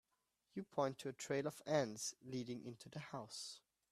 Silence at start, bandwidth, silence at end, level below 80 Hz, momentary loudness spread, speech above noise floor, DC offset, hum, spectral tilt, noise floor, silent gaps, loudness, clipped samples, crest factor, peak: 0.55 s; 14.5 kHz; 0.35 s; -84 dBFS; 13 LU; 41 dB; under 0.1%; none; -4.5 dB/octave; -86 dBFS; none; -45 LUFS; under 0.1%; 22 dB; -24 dBFS